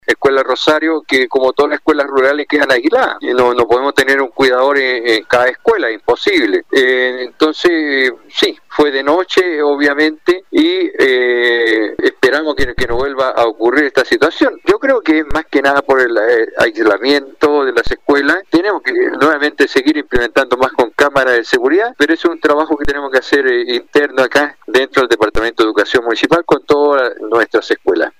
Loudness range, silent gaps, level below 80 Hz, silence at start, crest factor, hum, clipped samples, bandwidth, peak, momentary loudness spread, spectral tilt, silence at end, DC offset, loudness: 1 LU; none; -38 dBFS; 0.1 s; 10 dB; none; under 0.1%; 15.5 kHz; -2 dBFS; 4 LU; -4 dB/octave; 0.1 s; under 0.1%; -13 LUFS